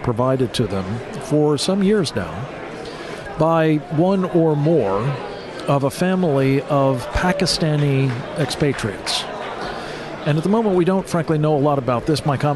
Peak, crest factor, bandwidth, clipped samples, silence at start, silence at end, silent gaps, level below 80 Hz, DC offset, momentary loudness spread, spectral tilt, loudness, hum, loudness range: -4 dBFS; 14 dB; 12 kHz; under 0.1%; 0 s; 0 s; none; -42 dBFS; under 0.1%; 11 LU; -6 dB/octave; -19 LUFS; none; 2 LU